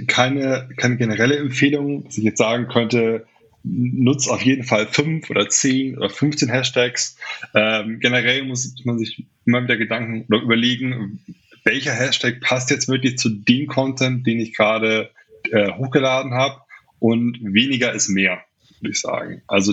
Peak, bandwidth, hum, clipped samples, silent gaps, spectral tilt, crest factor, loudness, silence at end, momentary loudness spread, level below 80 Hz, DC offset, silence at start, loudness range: 0 dBFS; 8.2 kHz; none; under 0.1%; none; -4 dB/octave; 18 dB; -19 LUFS; 0 s; 8 LU; -66 dBFS; under 0.1%; 0 s; 1 LU